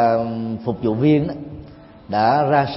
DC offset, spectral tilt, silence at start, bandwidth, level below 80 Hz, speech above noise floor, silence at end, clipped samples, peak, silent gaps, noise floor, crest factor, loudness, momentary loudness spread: under 0.1%; -11.5 dB/octave; 0 s; 5.8 kHz; -50 dBFS; 23 dB; 0 s; under 0.1%; -4 dBFS; none; -40 dBFS; 16 dB; -19 LUFS; 16 LU